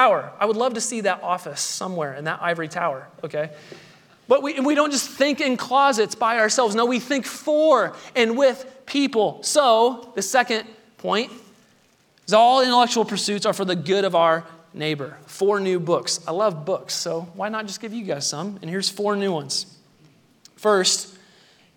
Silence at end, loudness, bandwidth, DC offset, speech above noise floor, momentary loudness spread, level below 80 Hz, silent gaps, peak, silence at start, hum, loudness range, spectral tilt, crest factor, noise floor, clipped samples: 0.65 s; -21 LUFS; 19 kHz; under 0.1%; 38 dB; 12 LU; -78 dBFS; none; -2 dBFS; 0 s; none; 6 LU; -3 dB/octave; 20 dB; -59 dBFS; under 0.1%